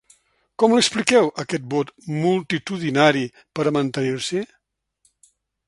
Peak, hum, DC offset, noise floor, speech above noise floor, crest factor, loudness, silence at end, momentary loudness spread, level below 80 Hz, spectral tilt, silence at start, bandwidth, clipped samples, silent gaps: 0 dBFS; none; under 0.1%; -72 dBFS; 52 dB; 22 dB; -21 LUFS; 1.2 s; 11 LU; -64 dBFS; -4.5 dB/octave; 0.6 s; 11.5 kHz; under 0.1%; none